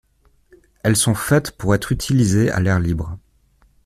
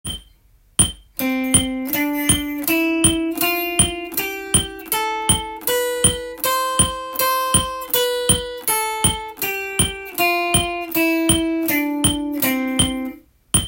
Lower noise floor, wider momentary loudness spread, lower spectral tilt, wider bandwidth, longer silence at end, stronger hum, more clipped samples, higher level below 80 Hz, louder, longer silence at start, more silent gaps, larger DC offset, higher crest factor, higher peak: about the same, -57 dBFS vs -54 dBFS; about the same, 8 LU vs 6 LU; first, -5.5 dB/octave vs -2.5 dB/octave; about the same, 15.5 kHz vs 17 kHz; first, 0.65 s vs 0 s; neither; neither; about the same, -40 dBFS vs -38 dBFS; about the same, -18 LUFS vs -18 LUFS; first, 0.85 s vs 0.05 s; neither; neither; about the same, 16 dB vs 20 dB; about the same, -2 dBFS vs 0 dBFS